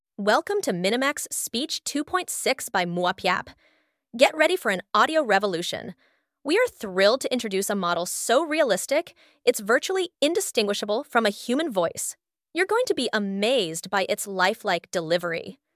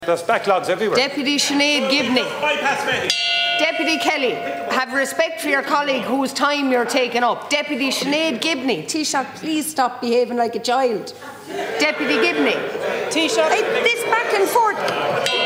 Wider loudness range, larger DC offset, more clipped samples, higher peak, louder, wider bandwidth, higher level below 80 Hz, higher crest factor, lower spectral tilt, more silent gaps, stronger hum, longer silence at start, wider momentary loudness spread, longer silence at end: about the same, 2 LU vs 3 LU; neither; neither; about the same, -4 dBFS vs -2 dBFS; second, -24 LUFS vs -19 LUFS; about the same, 16 kHz vs 16 kHz; about the same, -68 dBFS vs -68 dBFS; about the same, 22 dB vs 18 dB; about the same, -3 dB/octave vs -2.5 dB/octave; neither; neither; first, 0.2 s vs 0 s; about the same, 6 LU vs 5 LU; first, 0.25 s vs 0 s